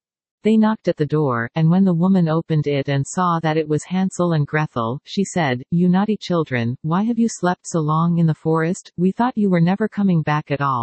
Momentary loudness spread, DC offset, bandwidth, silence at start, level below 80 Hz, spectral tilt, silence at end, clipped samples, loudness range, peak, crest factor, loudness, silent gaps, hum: 6 LU; under 0.1%; 8.8 kHz; 0.45 s; -60 dBFS; -7 dB/octave; 0 s; under 0.1%; 2 LU; -4 dBFS; 14 dB; -19 LUFS; none; none